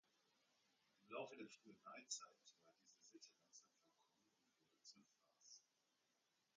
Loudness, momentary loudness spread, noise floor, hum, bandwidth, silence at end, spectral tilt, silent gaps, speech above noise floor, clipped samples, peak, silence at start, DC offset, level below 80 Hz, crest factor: -59 LUFS; 16 LU; -87 dBFS; none; 7.4 kHz; 0.95 s; -1.5 dB/octave; none; 26 dB; under 0.1%; -36 dBFS; 1 s; under 0.1%; under -90 dBFS; 28 dB